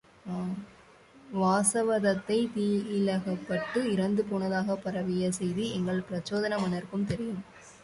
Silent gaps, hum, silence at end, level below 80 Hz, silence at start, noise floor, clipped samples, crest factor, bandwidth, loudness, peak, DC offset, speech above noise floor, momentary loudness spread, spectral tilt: none; none; 0.05 s; -62 dBFS; 0.25 s; -56 dBFS; under 0.1%; 18 dB; 11.5 kHz; -30 LUFS; -12 dBFS; under 0.1%; 27 dB; 10 LU; -5.5 dB/octave